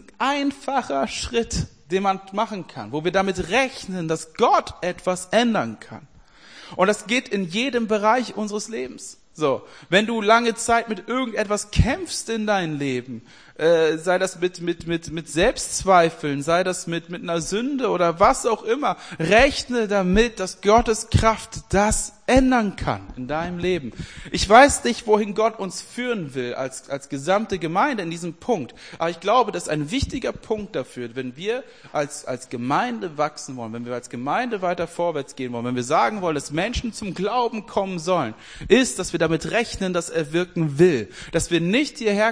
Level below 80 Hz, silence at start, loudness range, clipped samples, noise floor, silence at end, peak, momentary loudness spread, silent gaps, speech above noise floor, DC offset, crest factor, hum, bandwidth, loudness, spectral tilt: -40 dBFS; 0.2 s; 6 LU; under 0.1%; -47 dBFS; 0 s; 0 dBFS; 12 LU; none; 25 dB; 0.2%; 22 dB; none; 10.5 kHz; -22 LUFS; -4.5 dB/octave